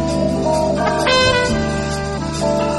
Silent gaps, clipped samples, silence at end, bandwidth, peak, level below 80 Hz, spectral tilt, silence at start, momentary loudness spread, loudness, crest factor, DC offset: none; under 0.1%; 0 s; 12 kHz; -2 dBFS; -32 dBFS; -4.5 dB/octave; 0 s; 8 LU; -17 LUFS; 16 dB; under 0.1%